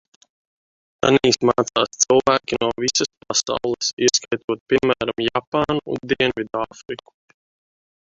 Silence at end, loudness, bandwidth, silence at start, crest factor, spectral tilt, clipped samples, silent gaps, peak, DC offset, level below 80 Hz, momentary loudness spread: 1.05 s; -20 LUFS; 7.8 kHz; 1.05 s; 20 dB; -3 dB/octave; under 0.1%; 3.17-3.21 s, 3.93-3.97 s, 4.44-4.48 s, 4.60-4.66 s, 5.47-5.52 s; -2 dBFS; under 0.1%; -54 dBFS; 9 LU